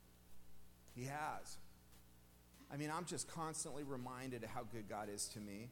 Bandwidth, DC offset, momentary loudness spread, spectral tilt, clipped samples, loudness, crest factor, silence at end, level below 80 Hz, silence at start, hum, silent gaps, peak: 17.5 kHz; under 0.1%; 22 LU; -4 dB/octave; under 0.1%; -47 LUFS; 18 dB; 0 s; -70 dBFS; 0 s; 60 Hz at -70 dBFS; none; -32 dBFS